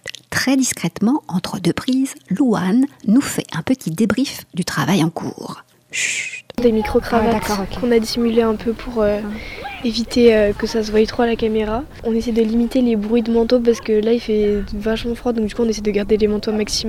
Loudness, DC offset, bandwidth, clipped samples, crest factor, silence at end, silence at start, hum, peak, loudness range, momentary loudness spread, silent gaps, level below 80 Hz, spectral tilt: -18 LUFS; under 0.1%; 16 kHz; under 0.1%; 16 dB; 0 s; 0.05 s; none; -2 dBFS; 2 LU; 7 LU; none; -38 dBFS; -5 dB/octave